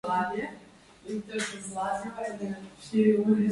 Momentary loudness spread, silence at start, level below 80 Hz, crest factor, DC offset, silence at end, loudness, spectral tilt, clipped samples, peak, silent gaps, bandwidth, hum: 16 LU; 0.05 s; -66 dBFS; 18 dB; under 0.1%; 0 s; -30 LUFS; -5.5 dB/octave; under 0.1%; -10 dBFS; none; 11.5 kHz; none